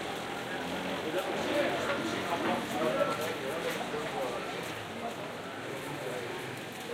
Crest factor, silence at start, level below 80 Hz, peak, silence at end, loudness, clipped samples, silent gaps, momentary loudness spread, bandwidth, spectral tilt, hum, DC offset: 20 dB; 0 s; -66 dBFS; -14 dBFS; 0 s; -34 LUFS; under 0.1%; none; 8 LU; 16 kHz; -4 dB/octave; none; under 0.1%